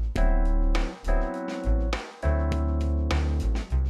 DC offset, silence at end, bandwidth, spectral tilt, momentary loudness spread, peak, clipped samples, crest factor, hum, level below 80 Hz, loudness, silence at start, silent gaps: under 0.1%; 0 s; 9.4 kHz; -7 dB/octave; 4 LU; -12 dBFS; under 0.1%; 12 dB; none; -24 dBFS; -28 LUFS; 0 s; none